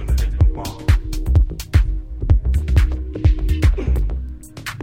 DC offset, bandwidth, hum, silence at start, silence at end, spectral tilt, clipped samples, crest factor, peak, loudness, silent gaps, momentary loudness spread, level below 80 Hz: under 0.1%; 16 kHz; none; 0 s; 0 s; -6.5 dB/octave; under 0.1%; 16 dB; -2 dBFS; -20 LUFS; none; 9 LU; -18 dBFS